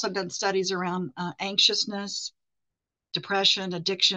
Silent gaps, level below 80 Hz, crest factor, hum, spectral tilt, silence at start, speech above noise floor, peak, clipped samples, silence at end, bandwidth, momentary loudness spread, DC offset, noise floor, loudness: none; -76 dBFS; 20 dB; none; -2.5 dB/octave; 0 s; 59 dB; -6 dBFS; under 0.1%; 0 s; 8.8 kHz; 12 LU; under 0.1%; -86 dBFS; -25 LUFS